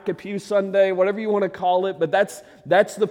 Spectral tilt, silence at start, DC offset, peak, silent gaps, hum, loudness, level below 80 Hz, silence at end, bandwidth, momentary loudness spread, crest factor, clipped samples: -5.5 dB/octave; 0.05 s; under 0.1%; -6 dBFS; none; none; -21 LUFS; -68 dBFS; 0 s; 16 kHz; 8 LU; 16 dB; under 0.1%